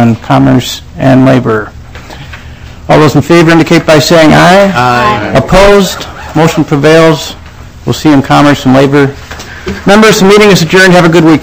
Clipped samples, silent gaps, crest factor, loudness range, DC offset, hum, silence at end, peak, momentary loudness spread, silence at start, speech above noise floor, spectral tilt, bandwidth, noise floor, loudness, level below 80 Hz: 20%; none; 6 dB; 3 LU; 1%; none; 0 s; 0 dBFS; 17 LU; 0 s; 21 dB; -5.5 dB/octave; over 20 kHz; -26 dBFS; -5 LUFS; -26 dBFS